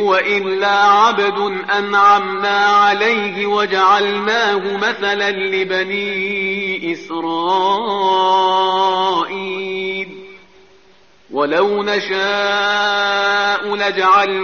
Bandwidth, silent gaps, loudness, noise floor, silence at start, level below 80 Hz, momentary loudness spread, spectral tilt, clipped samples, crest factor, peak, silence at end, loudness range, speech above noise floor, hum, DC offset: 7 kHz; none; -15 LUFS; -51 dBFS; 0 s; -62 dBFS; 9 LU; -0.5 dB/octave; under 0.1%; 14 dB; -2 dBFS; 0 s; 6 LU; 35 dB; none; 0.3%